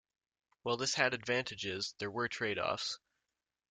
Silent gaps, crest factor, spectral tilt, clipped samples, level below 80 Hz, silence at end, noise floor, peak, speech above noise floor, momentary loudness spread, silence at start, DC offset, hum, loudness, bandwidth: none; 24 dB; -2.5 dB/octave; under 0.1%; -74 dBFS; 0.75 s; -88 dBFS; -14 dBFS; 51 dB; 8 LU; 0.65 s; under 0.1%; none; -36 LUFS; 9.6 kHz